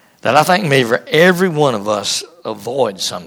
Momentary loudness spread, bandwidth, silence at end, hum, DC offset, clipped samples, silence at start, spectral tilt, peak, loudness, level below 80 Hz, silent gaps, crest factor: 9 LU; 19 kHz; 0 s; none; under 0.1%; under 0.1%; 0.25 s; -4 dB/octave; 0 dBFS; -14 LUFS; -60 dBFS; none; 14 dB